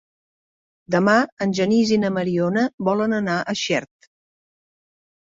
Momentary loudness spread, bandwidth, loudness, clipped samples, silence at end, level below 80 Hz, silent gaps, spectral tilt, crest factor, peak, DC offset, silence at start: 6 LU; 7.8 kHz; -20 LUFS; under 0.1%; 1.35 s; -62 dBFS; 1.32-1.37 s, 2.74-2.78 s; -5.5 dB/octave; 18 dB; -4 dBFS; under 0.1%; 0.9 s